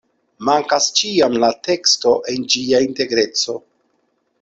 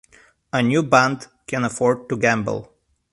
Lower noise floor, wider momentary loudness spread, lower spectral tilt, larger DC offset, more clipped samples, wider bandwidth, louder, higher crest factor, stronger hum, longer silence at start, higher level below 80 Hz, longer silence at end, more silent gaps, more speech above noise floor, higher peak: first, -66 dBFS vs -44 dBFS; second, 5 LU vs 12 LU; second, -2 dB/octave vs -5.5 dB/octave; neither; neither; second, 8.2 kHz vs 11.5 kHz; first, -16 LUFS vs -20 LUFS; second, 16 dB vs 22 dB; neither; second, 0.4 s vs 0.55 s; about the same, -58 dBFS vs -56 dBFS; first, 0.8 s vs 0.5 s; neither; first, 49 dB vs 25 dB; about the same, -2 dBFS vs 0 dBFS